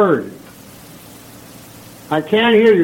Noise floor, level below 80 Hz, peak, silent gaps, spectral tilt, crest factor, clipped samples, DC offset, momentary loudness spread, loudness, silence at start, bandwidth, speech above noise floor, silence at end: -39 dBFS; -56 dBFS; -2 dBFS; none; -5.5 dB/octave; 14 dB; under 0.1%; under 0.1%; 26 LU; -15 LUFS; 0 s; 17 kHz; 26 dB; 0 s